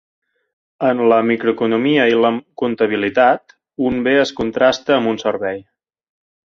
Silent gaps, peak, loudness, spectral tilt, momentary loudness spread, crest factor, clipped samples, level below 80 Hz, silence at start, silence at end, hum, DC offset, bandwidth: none; -2 dBFS; -16 LUFS; -5.5 dB/octave; 9 LU; 16 dB; under 0.1%; -54 dBFS; 0.8 s; 0.9 s; none; under 0.1%; 7.4 kHz